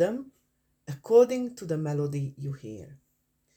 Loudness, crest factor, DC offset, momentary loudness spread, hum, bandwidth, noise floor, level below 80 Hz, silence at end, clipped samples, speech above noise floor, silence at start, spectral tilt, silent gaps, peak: -27 LUFS; 20 dB; under 0.1%; 21 LU; none; 15 kHz; -73 dBFS; -68 dBFS; 0.6 s; under 0.1%; 47 dB; 0 s; -7.5 dB/octave; none; -8 dBFS